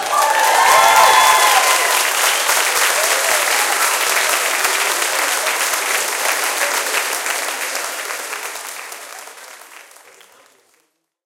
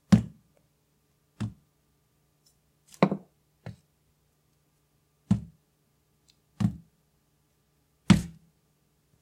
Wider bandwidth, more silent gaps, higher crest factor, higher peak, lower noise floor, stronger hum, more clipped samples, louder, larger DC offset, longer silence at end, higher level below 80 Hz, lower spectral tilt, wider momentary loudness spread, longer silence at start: first, 17.5 kHz vs 13.5 kHz; neither; second, 16 dB vs 28 dB; first, 0 dBFS vs -4 dBFS; second, -65 dBFS vs -70 dBFS; neither; neither; first, -14 LUFS vs -28 LUFS; neither; first, 1.45 s vs 0.9 s; second, -62 dBFS vs -52 dBFS; second, 2.5 dB/octave vs -7 dB/octave; second, 15 LU vs 24 LU; about the same, 0 s vs 0.1 s